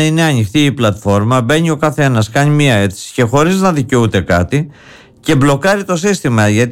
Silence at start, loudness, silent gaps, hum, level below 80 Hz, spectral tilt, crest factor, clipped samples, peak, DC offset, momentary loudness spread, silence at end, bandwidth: 0 s; -12 LUFS; none; none; -38 dBFS; -5.5 dB/octave; 10 dB; under 0.1%; -2 dBFS; under 0.1%; 4 LU; 0 s; 16.5 kHz